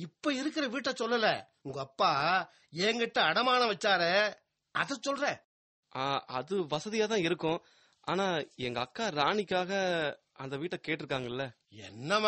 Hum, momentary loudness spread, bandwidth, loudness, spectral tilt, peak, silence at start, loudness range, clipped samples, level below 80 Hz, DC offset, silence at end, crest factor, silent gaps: none; 14 LU; 8.4 kHz; -31 LUFS; -4 dB/octave; -12 dBFS; 0 s; 5 LU; under 0.1%; -72 dBFS; under 0.1%; 0 s; 20 dB; 5.44-5.83 s